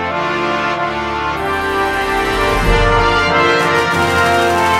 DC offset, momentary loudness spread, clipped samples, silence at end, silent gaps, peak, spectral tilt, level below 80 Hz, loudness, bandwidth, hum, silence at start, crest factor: under 0.1%; 6 LU; under 0.1%; 0 s; none; 0 dBFS; -4.5 dB/octave; -26 dBFS; -14 LUFS; 16 kHz; none; 0 s; 14 dB